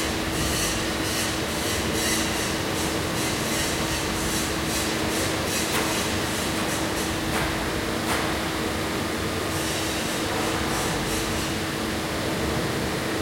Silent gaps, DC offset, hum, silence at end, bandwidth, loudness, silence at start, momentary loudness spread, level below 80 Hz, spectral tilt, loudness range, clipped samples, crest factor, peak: none; under 0.1%; none; 0 s; 16.5 kHz; -25 LUFS; 0 s; 3 LU; -40 dBFS; -3.5 dB/octave; 1 LU; under 0.1%; 14 dB; -12 dBFS